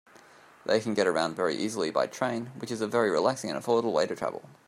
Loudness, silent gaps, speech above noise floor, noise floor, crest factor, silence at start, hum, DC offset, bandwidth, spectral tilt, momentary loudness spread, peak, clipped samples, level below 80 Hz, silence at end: -28 LUFS; none; 27 dB; -55 dBFS; 18 dB; 0.65 s; none; under 0.1%; 15 kHz; -4.5 dB/octave; 9 LU; -10 dBFS; under 0.1%; -72 dBFS; 0.15 s